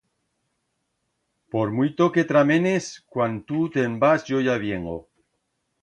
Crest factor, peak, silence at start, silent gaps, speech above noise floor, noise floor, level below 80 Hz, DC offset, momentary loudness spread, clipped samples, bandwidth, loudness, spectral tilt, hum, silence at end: 18 dB; -6 dBFS; 1.55 s; none; 53 dB; -75 dBFS; -58 dBFS; under 0.1%; 12 LU; under 0.1%; 10.5 kHz; -22 LUFS; -6.5 dB/octave; none; 0.8 s